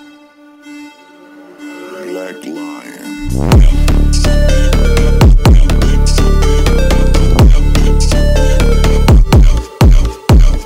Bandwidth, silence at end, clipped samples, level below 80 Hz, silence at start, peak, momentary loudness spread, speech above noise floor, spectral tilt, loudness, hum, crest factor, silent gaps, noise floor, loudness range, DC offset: 15.5 kHz; 0 s; under 0.1%; -10 dBFS; 0 s; -2 dBFS; 17 LU; 30 dB; -6 dB/octave; -11 LUFS; none; 8 dB; none; -40 dBFS; 7 LU; under 0.1%